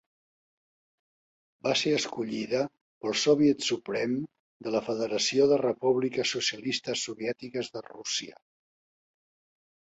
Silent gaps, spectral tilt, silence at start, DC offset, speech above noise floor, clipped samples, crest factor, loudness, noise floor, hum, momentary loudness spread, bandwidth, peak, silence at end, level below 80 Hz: 2.81-3.01 s, 4.39-4.60 s; -3.5 dB/octave; 1.65 s; under 0.1%; over 62 dB; under 0.1%; 20 dB; -28 LUFS; under -90 dBFS; none; 12 LU; 8.2 kHz; -12 dBFS; 1.6 s; -72 dBFS